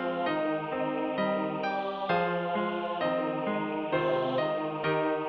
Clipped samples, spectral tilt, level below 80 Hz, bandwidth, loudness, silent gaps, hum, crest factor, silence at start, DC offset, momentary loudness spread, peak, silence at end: under 0.1%; -8.5 dB/octave; -68 dBFS; 6 kHz; -30 LUFS; none; none; 14 dB; 0 s; under 0.1%; 3 LU; -16 dBFS; 0 s